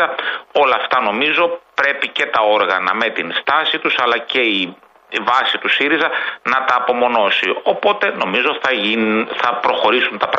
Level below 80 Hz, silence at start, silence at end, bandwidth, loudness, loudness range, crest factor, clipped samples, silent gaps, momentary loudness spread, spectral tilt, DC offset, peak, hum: -66 dBFS; 0 s; 0 s; 8.2 kHz; -16 LUFS; 1 LU; 14 dB; under 0.1%; none; 4 LU; -4 dB/octave; under 0.1%; -2 dBFS; none